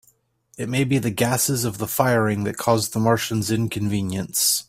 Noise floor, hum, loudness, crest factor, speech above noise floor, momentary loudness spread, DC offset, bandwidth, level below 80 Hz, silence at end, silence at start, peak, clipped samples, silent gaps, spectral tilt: -62 dBFS; none; -21 LUFS; 20 dB; 40 dB; 5 LU; under 0.1%; 16 kHz; -54 dBFS; 0.05 s; 0.6 s; -2 dBFS; under 0.1%; none; -4.5 dB/octave